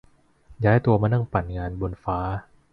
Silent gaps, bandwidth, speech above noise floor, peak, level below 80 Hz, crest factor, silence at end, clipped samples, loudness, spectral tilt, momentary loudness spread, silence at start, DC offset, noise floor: none; 4.8 kHz; 30 dB; -6 dBFS; -40 dBFS; 18 dB; 0.3 s; under 0.1%; -24 LUFS; -10.5 dB/octave; 11 LU; 0.5 s; under 0.1%; -53 dBFS